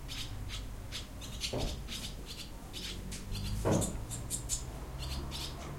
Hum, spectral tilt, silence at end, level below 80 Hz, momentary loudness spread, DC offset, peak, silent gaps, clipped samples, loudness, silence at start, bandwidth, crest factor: none; -4 dB/octave; 0 s; -44 dBFS; 11 LU; under 0.1%; -18 dBFS; none; under 0.1%; -39 LUFS; 0 s; 16.5 kHz; 22 dB